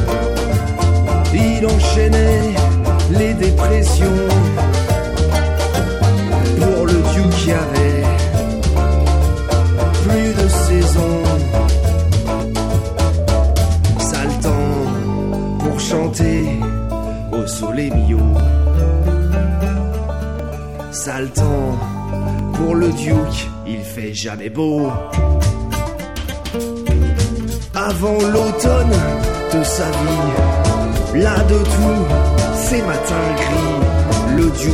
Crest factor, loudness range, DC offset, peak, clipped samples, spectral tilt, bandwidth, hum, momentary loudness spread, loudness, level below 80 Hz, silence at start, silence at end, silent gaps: 14 dB; 5 LU; 0.8%; -2 dBFS; under 0.1%; -6 dB/octave; 15.5 kHz; none; 8 LU; -16 LUFS; -20 dBFS; 0 s; 0 s; none